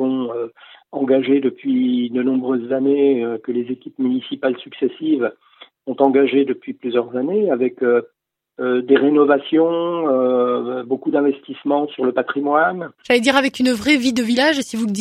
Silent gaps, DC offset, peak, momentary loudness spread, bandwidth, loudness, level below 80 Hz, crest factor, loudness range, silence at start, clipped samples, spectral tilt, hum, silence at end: none; under 0.1%; 0 dBFS; 9 LU; 13.5 kHz; -18 LUFS; -62 dBFS; 18 dB; 3 LU; 0 s; under 0.1%; -5 dB/octave; none; 0 s